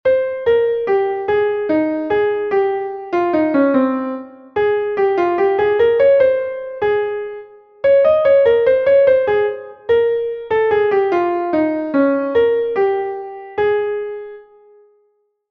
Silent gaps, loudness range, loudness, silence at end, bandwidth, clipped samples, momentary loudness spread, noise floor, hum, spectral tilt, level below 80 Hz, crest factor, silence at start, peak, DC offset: none; 3 LU; -16 LUFS; 1.1 s; 5.4 kHz; under 0.1%; 12 LU; -63 dBFS; none; -7.5 dB/octave; -54 dBFS; 14 dB; 0.05 s; -2 dBFS; under 0.1%